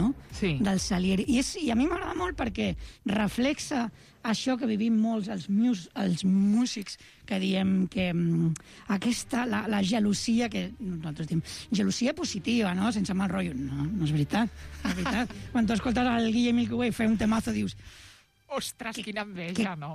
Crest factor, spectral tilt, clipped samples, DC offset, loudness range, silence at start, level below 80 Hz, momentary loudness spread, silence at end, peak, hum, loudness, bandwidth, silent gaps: 12 dB; -5.5 dB/octave; under 0.1%; under 0.1%; 2 LU; 0 s; -48 dBFS; 9 LU; 0 s; -16 dBFS; none; -28 LUFS; 14.5 kHz; none